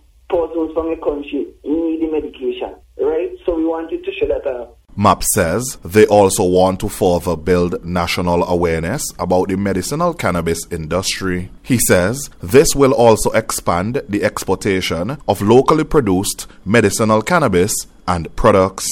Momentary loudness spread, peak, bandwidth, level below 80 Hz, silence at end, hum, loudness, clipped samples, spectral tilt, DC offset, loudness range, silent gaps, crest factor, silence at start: 10 LU; 0 dBFS; 17 kHz; -36 dBFS; 0 s; none; -16 LUFS; under 0.1%; -5 dB/octave; under 0.1%; 6 LU; none; 16 dB; 0.3 s